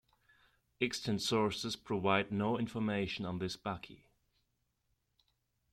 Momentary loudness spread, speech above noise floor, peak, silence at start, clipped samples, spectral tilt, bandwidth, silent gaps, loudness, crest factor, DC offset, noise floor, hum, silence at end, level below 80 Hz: 9 LU; 45 dB; -16 dBFS; 0.8 s; under 0.1%; -5 dB/octave; 14.5 kHz; none; -36 LUFS; 22 dB; under 0.1%; -81 dBFS; none; 1.75 s; -68 dBFS